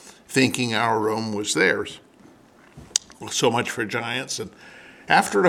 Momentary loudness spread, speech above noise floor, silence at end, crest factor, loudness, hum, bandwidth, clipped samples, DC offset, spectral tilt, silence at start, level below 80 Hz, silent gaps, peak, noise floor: 11 LU; 29 dB; 0 s; 22 dB; -23 LUFS; none; 18 kHz; under 0.1%; under 0.1%; -3 dB/octave; 0.05 s; -64 dBFS; none; -2 dBFS; -52 dBFS